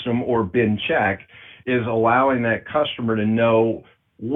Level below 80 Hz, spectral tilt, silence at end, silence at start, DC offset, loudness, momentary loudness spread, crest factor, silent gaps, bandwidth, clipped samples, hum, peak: -54 dBFS; -9 dB/octave; 0 s; 0 s; under 0.1%; -20 LUFS; 9 LU; 16 dB; none; 3.9 kHz; under 0.1%; none; -4 dBFS